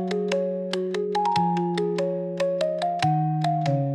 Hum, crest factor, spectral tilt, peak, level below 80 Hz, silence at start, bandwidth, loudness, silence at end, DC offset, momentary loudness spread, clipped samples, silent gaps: none; 16 dB; -7 dB/octave; -8 dBFS; -68 dBFS; 0 s; 11 kHz; -25 LUFS; 0 s; under 0.1%; 4 LU; under 0.1%; none